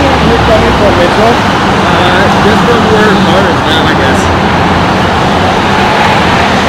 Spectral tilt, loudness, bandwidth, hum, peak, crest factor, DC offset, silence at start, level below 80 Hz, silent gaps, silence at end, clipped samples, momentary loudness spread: -5.5 dB/octave; -7 LUFS; 16.5 kHz; none; 0 dBFS; 6 dB; 0.2%; 0 s; -24 dBFS; none; 0 s; 2%; 2 LU